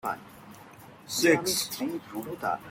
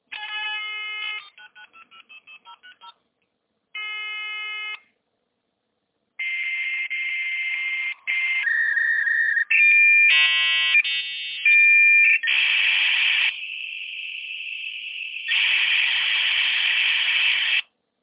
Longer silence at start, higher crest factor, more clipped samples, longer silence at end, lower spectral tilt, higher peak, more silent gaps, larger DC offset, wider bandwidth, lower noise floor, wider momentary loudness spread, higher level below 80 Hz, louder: about the same, 0.05 s vs 0.1 s; first, 22 dB vs 14 dB; neither; second, 0 s vs 0.4 s; first, -3 dB/octave vs 8.5 dB/octave; about the same, -10 dBFS vs -8 dBFS; neither; neither; first, 17 kHz vs 4 kHz; second, -50 dBFS vs -75 dBFS; first, 25 LU vs 17 LU; first, -66 dBFS vs -84 dBFS; second, -28 LUFS vs -18 LUFS